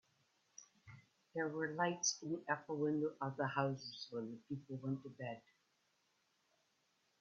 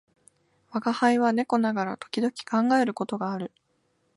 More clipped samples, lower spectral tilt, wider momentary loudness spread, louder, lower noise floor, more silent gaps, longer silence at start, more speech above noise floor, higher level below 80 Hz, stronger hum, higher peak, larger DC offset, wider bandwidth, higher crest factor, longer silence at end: neither; about the same, -4.5 dB/octave vs -5.5 dB/octave; first, 22 LU vs 10 LU; second, -42 LUFS vs -26 LUFS; first, -80 dBFS vs -71 dBFS; neither; second, 0.6 s vs 0.75 s; second, 39 dB vs 46 dB; second, -84 dBFS vs -76 dBFS; neither; second, -22 dBFS vs -8 dBFS; neither; second, 7.4 kHz vs 11.5 kHz; about the same, 22 dB vs 18 dB; first, 1.8 s vs 0.7 s